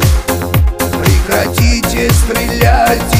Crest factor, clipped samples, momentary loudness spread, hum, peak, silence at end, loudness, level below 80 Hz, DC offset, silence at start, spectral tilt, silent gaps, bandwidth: 10 dB; under 0.1%; 4 LU; none; 0 dBFS; 0 s; -12 LUFS; -16 dBFS; under 0.1%; 0 s; -5 dB/octave; none; 16.5 kHz